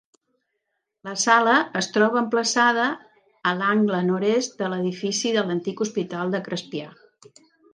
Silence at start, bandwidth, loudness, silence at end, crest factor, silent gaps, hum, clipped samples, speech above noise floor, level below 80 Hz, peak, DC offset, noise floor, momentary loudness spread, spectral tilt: 1.05 s; 10 kHz; -22 LUFS; 0.85 s; 20 dB; none; none; under 0.1%; 56 dB; -76 dBFS; -4 dBFS; under 0.1%; -78 dBFS; 11 LU; -4 dB/octave